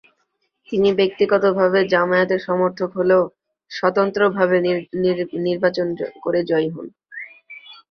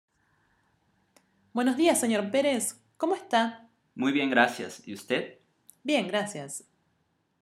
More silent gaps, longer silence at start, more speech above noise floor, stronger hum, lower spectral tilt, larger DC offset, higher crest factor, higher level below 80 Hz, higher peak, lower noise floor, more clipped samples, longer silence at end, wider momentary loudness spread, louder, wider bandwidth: neither; second, 0.7 s vs 1.55 s; first, 52 dB vs 46 dB; neither; first, -7 dB/octave vs -3 dB/octave; neither; second, 18 dB vs 24 dB; first, -62 dBFS vs -82 dBFS; first, -2 dBFS vs -6 dBFS; about the same, -70 dBFS vs -73 dBFS; neither; second, 0.2 s vs 0.85 s; about the same, 18 LU vs 16 LU; first, -19 LUFS vs -27 LUFS; second, 6.4 kHz vs 15.5 kHz